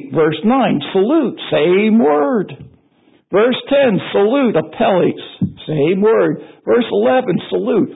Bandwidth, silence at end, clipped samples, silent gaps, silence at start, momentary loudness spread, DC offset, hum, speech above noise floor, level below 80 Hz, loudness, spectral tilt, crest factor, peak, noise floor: 4 kHz; 0 s; under 0.1%; none; 0 s; 6 LU; under 0.1%; none; 40 dB; -54 dBFS; -15 LUFS; -12 dB/octave; 12 dB; -2 dBFS; -54 dBFS